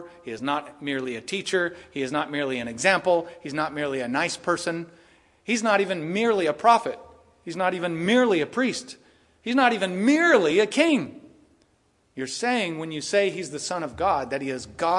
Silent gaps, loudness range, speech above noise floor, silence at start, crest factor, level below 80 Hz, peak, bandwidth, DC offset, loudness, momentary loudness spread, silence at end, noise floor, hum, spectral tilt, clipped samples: none; 4 LU; 41 dB; 0 s; 20 dB; -64 dBFS; -4 dBFS; 11.5 kHz; under 0.1%; -24 LUFS; 14 LU; 0 s; -65 dBFS; none; -4 dB/octave; under 0.1%